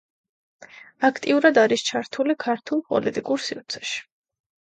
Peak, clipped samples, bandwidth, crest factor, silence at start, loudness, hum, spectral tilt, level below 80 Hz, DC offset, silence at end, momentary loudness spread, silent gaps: -4 dBFS; under 0.1%; 9.2 kHz; 20 dB; 0.75 s; -23 LUFS; none; -3.5 dB/octave; -70 dBFS; under 0.1%; 0.65 s; 12 LU; none